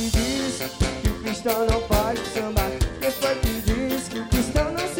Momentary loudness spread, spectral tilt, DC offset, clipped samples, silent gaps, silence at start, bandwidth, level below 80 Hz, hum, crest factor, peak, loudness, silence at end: 4 LU; -5 dB/octave; under 0.1%; under 0.1%; none; 0 s; 17 kHz; -30 dBFS; none; 14 dB; -10 dBFS; -24 LUFS; 0 s